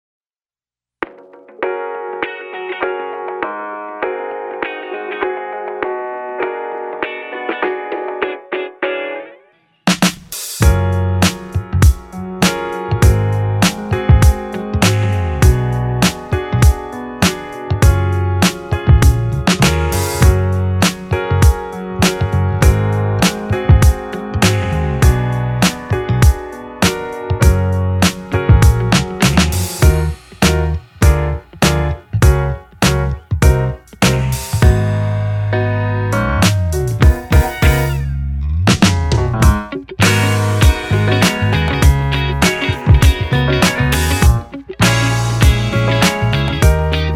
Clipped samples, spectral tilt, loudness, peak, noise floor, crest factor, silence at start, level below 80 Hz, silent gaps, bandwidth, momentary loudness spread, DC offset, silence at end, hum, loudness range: under 0.1%; -5 dB/octave; -15 LUFS; 0 dBFS; under -90 dBFS; 14 dB; 1 s; -20 dBFS; none; 17.5 kHz; 10 LU; under 0.1%; 0 s; none; 9 LU